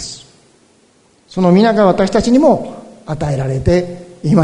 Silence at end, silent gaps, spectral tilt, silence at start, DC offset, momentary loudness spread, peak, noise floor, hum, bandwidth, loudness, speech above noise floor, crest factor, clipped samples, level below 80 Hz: 0 s; none; -7 dB/octave; 0 s; under 0.1%; 17 LU; 0 dBFS; -52 dBFS; none; 10.5 kHz; -13 LUFS; 40 dB; 14 dB; under 0.1%; -36 dBFS